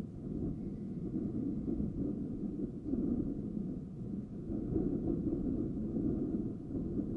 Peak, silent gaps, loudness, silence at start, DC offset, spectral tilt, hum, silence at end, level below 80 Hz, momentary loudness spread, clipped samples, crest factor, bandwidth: -22 dBFS; none; -38 LUFS; 0 s; under 0.1%; -12 dB/octave; none; 0 s; -50 dBFS; 6 LU; under 0.1%; 14 dB; 4 kHz